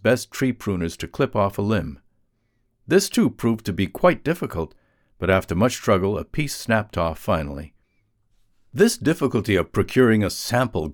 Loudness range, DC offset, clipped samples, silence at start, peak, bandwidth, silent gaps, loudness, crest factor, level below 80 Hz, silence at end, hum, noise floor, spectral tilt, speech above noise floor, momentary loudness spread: 2 LU; under 0.1%; under 0.1%; 0.05 s; -4 dBFS; 20 kHz; none; -22 LUFS; 18 dB; -44 dBFS; 0 s; none; -68 dBFS; -5.5 dB/octave; 47 dB; 9 LU